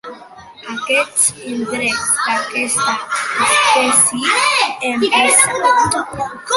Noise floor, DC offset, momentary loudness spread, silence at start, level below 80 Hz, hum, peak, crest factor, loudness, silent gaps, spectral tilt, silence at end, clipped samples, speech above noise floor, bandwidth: -38 dBFS; under 0.1%; 14 LU; 0.05 s; -52 dBFS; none; 0 dBFS; 16 dB; -14 LUFS; none; -0.5 dB/octave; 0 s; under 0.1%; 22 dB; 16 kHz